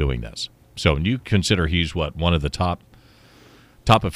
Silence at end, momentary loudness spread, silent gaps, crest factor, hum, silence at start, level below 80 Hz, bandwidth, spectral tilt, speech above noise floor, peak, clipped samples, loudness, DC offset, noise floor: 0 s; 12 LU; none; 20 dB; none; 0 s; -32 dBFS; 14.5 kHz; -5.5 dB/octave; 30 dB; -2 dBFS; under 0.1%; -22 LUFS; under 0.1%; -50 dBFS